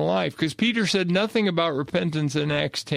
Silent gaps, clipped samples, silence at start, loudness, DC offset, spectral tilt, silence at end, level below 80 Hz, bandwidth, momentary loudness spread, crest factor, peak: none; under 0.1%; 0 s; -23 LUFS; under 0.1%; -5 dB/octave; 0 s; -60 dBFS; 15 kHz; 4 LU; 16 dB; -8 dBFS